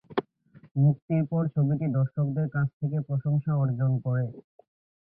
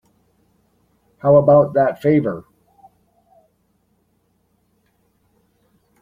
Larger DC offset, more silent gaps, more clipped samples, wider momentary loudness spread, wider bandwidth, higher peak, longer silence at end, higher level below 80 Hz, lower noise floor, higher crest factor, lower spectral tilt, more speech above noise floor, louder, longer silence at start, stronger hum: neither; first, 0.71-0.75 s, 1.02-1.08 s, 2.73-2.80 s vs none; neither; second, 6 LU vs 13 LU; second, 3.8 kHz vs 4.5 kHz; second, -12 dBFS vs -2 dBFS; second, 0.65 s vs 3.6 s; about the same, -62 dBFS vs -58 dBFS; second, -56 dBFS vs -64 dBFS; second, 14 dB vs 20 dB; first, -13 dB/octave vs -10.5 dB/octave; second, 30 dB vs 50 dB; second, -27 LUFS vs -15 LUFS; second, 0.1 s vs 1.25 s; neither